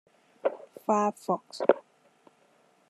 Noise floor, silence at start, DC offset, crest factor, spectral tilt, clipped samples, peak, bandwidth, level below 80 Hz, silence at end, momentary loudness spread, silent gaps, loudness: -65 dBFS; 0.45 s; under 0.1%; 26 dB; -5.5 dB/octave; under 0.1%; -4 dBFS; 13.5 kHz; under -90 dBFS; 1.1 s; 7 LU; none; -29 LUFS